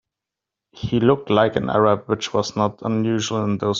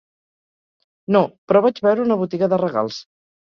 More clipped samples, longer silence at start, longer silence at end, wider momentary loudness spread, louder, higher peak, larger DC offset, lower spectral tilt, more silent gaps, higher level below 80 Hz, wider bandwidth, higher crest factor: neither; second, 0.75 s vs 1.1 s; second, 0 s vs 0.4 s; second, 5 LU vs 10 LU; about the same, -20 LUFS vs -19 LUFS; about the same, -2 dBFS vs -2 dBFS; neither; second, -6 dB/octave vs -7.5 dB/octave; second, none vs 1.38-1.48 s; first, -52 dBFS vs -64 dBFS; first, 7.6 kHz vs 6.8 kHz; about the same, 18 dB vs 18 dB